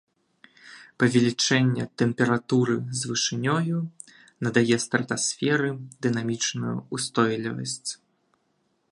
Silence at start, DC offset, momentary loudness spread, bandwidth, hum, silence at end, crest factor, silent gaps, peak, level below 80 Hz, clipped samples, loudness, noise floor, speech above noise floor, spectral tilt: 0.65 s; under 0.1%; 9 LU; 11.5 kHz; none; 0.95 s; 20 dB; none; -6 dBFS; -66 dBFS; under 0.1%; -25 LUFS; -71 dBFS; 47 dB; -4.5 dB/octave